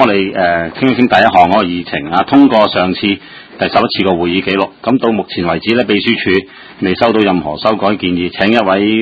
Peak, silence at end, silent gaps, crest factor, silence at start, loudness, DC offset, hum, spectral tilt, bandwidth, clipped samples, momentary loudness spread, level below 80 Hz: 0 dBFS; 0 s; none; 12 dB; 0 s; -12 LUFS; under 0.1%; none; -7.5 dB/octave; 8 kHz; 0.3%; 8 LU; -42 dBFS